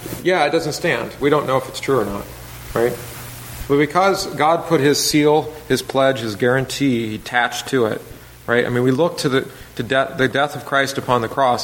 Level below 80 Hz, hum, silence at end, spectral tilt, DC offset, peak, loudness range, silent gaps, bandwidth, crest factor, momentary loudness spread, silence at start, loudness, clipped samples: -46 dBFS; none; 0 s; -4.5 dB/octave; under 0.1%; 0 dBFS; 3 LU; none; 17 kHz; 18 dB; 14 LU; 0 s; -18 LUFS; under 0.1%